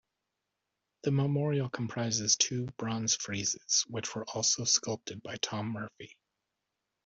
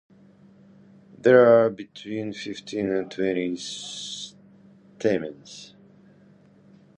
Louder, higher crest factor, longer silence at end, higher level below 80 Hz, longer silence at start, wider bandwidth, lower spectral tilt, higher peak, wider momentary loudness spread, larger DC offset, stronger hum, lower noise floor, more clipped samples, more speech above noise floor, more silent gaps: second, -31 LUFS vs -23 LUFS; about the same, 22 dB vs 22 dB; second, 0.9 s vs 1.35 s; second, -72 dBFS vs -66 dBFS; second, 1.05 s vs 1.25 s; second, 8 kHz vs 10 kHz; second, -3 dB/octave vs -5 dB/octave; second, -12 dBFS vs -4 dBFS; second, 12 LU vs 22 LU; neither; neither; first, -86 dBFS vs -54 dBFS; neither; first, 54 dB vs 31 dB; neither